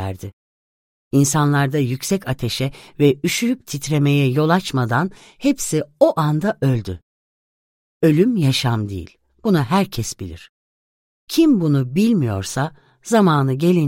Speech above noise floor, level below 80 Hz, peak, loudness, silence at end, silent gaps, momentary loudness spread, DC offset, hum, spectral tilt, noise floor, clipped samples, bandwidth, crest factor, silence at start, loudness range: over 72 dB; -48 dBFS; -2 dBFS; -19 LUFS; 0 s; 0.33-1.11 s, 7.03-8.00 s, 10.49-11.27 s; 11 LU; under 0.1%; none; -6 dB/octave; under -90 dBFS; under 0.1%; 16.5 kHz; 18 dB; 0 s; 2 LU